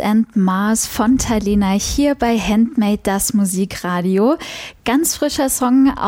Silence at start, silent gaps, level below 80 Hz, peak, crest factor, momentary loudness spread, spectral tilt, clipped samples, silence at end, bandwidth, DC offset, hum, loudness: 0 s; none; -36 dBFS; -4 dBFS; 12 dB; 4 LU; -4.5 dB/octave; under 0.1%; 0 s; 17 kHz; under 0.1%; none; -16 LUFS